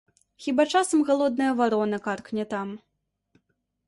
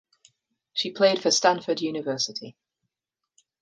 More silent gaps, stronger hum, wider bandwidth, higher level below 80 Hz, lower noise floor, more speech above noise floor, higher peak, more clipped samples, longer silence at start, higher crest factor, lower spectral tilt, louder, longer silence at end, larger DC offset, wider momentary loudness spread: neither; neither; about the same, 11.5 kHz vs 10.5 kHz; first, -70 dBFS vs -78 dBFS; second, -74 dBFS vs -87 dBFS; second, 50 dB vs 62 dB; second, -10 dBFS vs -6 dBFS; neither; second, 0.4 s vs 0.75 s; second, 16 dB vs 22 dB; first, -4.5 dB/octave vs -2.5 dB/octave; about the same, -25 LUFS vs -24 LUFS; about the same, 1.1 s vs 1.1 s; neither; about the same, 12 LU vs 12 LU